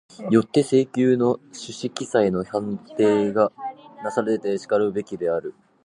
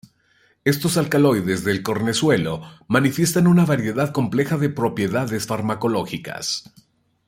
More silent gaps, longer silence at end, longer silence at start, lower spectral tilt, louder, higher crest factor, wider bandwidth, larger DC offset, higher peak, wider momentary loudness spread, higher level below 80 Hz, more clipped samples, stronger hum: neither; second, 0.35 s vs 0.65 s; second, 0.2 s vs 0.65 s; about the same, -6.5 dB/octave vs -5.5 dB/octave; about the same, -22 LUFS vs -20 LUFS; about the same, 18 dB vs 18 dB; second, 11 kHz vs 16.5 kHz; neither; about the same, -4 dBFS vs -2 dBFS; first, 12 LU vs 8 LU; second, -62 dBFS vs -56 dBFS; neither; neither